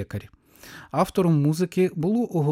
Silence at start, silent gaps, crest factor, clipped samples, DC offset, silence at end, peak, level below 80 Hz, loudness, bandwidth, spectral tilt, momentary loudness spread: 0 s; none; 16 dB; under 0.1%; under 0.1%; 0 s; -8 dBFS; -56 dBFS; -23 LUFS; 16 kHz; -7.5 dB/octave; 17 LU